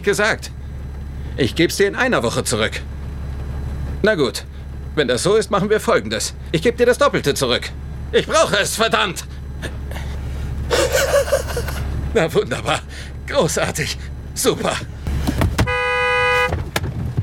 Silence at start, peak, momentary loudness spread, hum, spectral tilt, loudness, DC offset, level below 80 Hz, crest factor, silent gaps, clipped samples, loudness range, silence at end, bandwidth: 0 s; 0 dBFS; 13 LU; none; -4 dB/octave; -19 LUFS; under 0.1%; -30 dBFS; 18 dB; none; under 0.1%; 3 LU; 0 s; 17 kHz